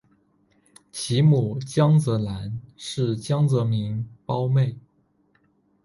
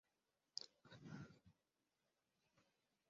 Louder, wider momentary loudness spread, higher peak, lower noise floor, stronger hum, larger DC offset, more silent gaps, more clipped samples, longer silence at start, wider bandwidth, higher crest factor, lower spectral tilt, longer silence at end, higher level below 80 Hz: first, -23 LUFS vs -58 LUFS; first, 14 LU vs 9 LU; first, -8 dBFS vs -30 dBFS; second, -65 dBFS vs -90 dBFS; neither; neither; neither; neither; first, 0.95 s vs 0.55 s; first, 11.5 kHz vs 7.4 kHz; second, 16 dB vs 34 dB; first, -7 dB/octave vs -3.5 dB/octave; first, 1.05 s vs 0.45 s; first, -54 dBFS vs -88 dBFS